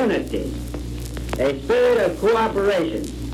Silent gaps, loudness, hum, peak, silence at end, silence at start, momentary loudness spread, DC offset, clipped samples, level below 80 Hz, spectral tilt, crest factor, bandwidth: none; -21 LUFS; none; -8 dBFS; 0 s; 0 s; 13 LU; under 0.1%; under 0.1%; -34 dBFS; -6 dB/octave; 14 dB; 15.5 kHz